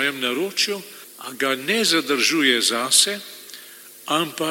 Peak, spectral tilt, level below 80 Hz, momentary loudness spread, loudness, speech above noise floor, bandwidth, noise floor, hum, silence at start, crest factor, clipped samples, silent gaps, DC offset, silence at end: -2 dBFS; -1 dB/octave; -78 dBFS; 21 LU; -19 LUFS; 21 dB; 17 kHz; -43 dBFS; none; 0 s; 20 dB; under 0.1%; none; under 0.1%; 0 s